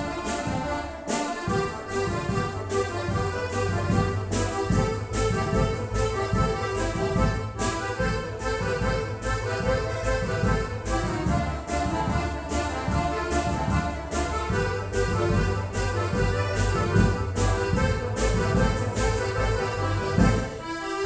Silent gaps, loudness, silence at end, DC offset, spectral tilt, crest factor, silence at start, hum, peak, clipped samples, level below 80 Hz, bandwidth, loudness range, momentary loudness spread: none; -26 LUFS; 0 s; under 0.1%; -6 dB/octave; 18 dB; 0 s; none; -8 dBFS; under 0.1%; -32 dBFS; 8 kHz; 2 LU; 5 LU